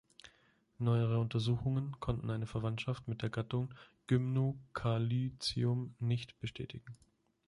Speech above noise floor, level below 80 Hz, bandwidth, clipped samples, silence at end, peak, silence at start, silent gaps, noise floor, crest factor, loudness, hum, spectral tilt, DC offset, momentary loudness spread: 35 dB; -58 dBFS; 11.5 kHz; under 0.1%; 0.5 s; -20 dBFS; 0.25 s; none; -71 dBFS; 16 dB; -37 LUFS; none; -7 dB/octave; under 0.1%; 11 LU